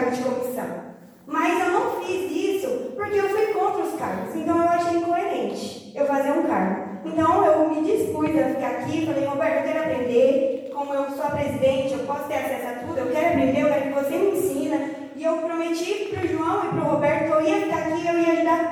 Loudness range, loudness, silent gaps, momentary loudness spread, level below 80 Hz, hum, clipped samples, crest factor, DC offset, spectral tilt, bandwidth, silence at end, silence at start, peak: 2 LU; -23 LUFS; none; 8 LU; -62 dBFS; none; under 0.1%; 16 dB; under 0.1%; -6 dB/octave; 19.5 kHz; 0 s; 0 s; -8 dBFS